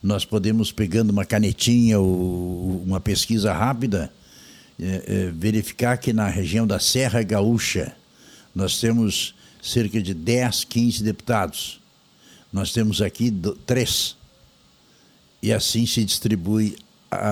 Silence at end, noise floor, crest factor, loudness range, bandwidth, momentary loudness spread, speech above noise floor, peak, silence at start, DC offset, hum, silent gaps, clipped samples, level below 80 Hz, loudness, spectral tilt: 0 s; -56 dBFS; 18 dB; 4 LU; 18.5 kHz; 9 LU; 34 dB; -6 dBFS; 0.05 s; under 0.1%; none; none; under 0.1%; -46 dBFS; -22 LUFS; -5 dB/octave